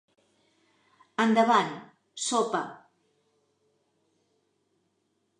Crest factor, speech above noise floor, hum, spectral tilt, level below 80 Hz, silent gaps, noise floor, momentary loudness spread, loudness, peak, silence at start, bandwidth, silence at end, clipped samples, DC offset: 22 dB; 50 dB; none; -3.5 dB/octave; -86 dBFS; none; -75 dBFS; 20 LU; -26 LUFS; -10 dBFS; 1.2 s; 11 kHz; 2.65 s; under 0.1%; under 0.1%